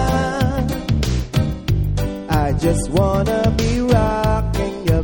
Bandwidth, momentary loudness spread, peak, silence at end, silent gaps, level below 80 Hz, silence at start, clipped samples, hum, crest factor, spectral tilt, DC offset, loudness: 18.5 kHz; 5 LU; -2 dBFS; 0 s; none; -24 dBFS; 0 s; under 0.1%; none; 16 dB; -6.5 dB/octave; under 0.1%; -19 LUFS